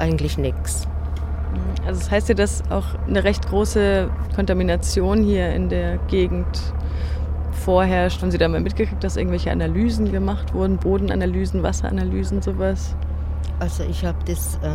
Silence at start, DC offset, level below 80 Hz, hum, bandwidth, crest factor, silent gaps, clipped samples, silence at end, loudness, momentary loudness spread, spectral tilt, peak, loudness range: 0 s; under 0.1%; -24 dBFS; none; 14.5 kHz; 16 dB; none; under 0.1%; 0 s; -22 LUFS; 7 LU; -6.5 dB/octave; -4 dBFS; 3 LU